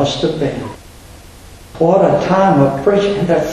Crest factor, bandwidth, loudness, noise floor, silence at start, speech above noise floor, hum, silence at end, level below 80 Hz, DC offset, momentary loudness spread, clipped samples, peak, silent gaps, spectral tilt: 14 dB; 13.5 kHz; -13 LUFS; -37 dBFS; 0 s; 24 dB; none; 0 s; -40 dBFS; under 0.1%; 9 LU; under 0.1%; 0 dBFS; none; -6.5 dB/octave